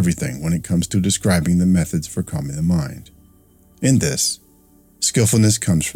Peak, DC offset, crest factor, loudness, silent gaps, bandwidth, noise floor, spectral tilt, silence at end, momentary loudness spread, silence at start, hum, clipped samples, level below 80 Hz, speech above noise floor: -4 dBFS; under 0.1%; 16 dB; -18 LUFS; none; 16.5 kHz; -52 dBFS; -5 dB/octave; 0.05 s; 10 LU; 0 s; none; under 0.1%; -40 dBFS; 34 dB